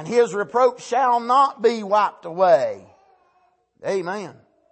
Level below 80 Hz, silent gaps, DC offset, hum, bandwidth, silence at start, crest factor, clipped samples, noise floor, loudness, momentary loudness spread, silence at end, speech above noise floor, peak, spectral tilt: -76 dBFS; none; under 0.1%; none; 8.8 kHz; 0 s; 16 dB; under 0.1%; -63 dBFS; -20 LUFS; 14 LU; 0.4 s; 43 dB; -4 dBFS; -4.5 dB/octave